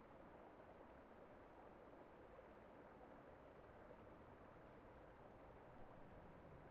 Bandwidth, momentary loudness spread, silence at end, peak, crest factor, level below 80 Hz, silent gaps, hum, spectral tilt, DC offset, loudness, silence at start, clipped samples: 5 kHz; 1 LU; 0 s; -48 dBFS; 14 dB; -74 dBFS; none; none; -6 dB/octave; under 0.1%; -64 LUFS; 0 s; under 0.1%